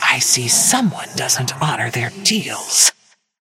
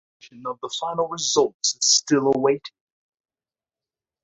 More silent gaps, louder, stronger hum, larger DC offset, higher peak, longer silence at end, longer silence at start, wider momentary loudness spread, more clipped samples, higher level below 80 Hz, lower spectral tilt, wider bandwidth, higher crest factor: second, none vs 1.54-1.60 s; first, -15 LUFS vs -21 LUFS; neither; neither; first, 0 dBFS vs -6 dBFS; second, 0.55 s vs 1.55 s; second, 0 s vs 0.25 s; second, 9 LU vs 16 LU; neither; first, -62 dBFS vs -68 dBFS; about the same, -1.5 dB/octave vs -2 dB/octave; first, 17 kHz vs 8 kHz; about the same, 18 dB vs 20 dB